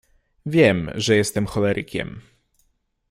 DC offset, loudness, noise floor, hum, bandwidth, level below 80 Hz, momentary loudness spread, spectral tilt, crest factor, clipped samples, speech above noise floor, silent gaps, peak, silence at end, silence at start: under 0.1%; -20 LUFS; -67 dBFS; none; 16 kHz; -50 dBFS; 13 LU; -5 dB/octave; 20 dB; under 0.1%; 47 dB; none; -2 dBFS; 0.9 s; 0.45 s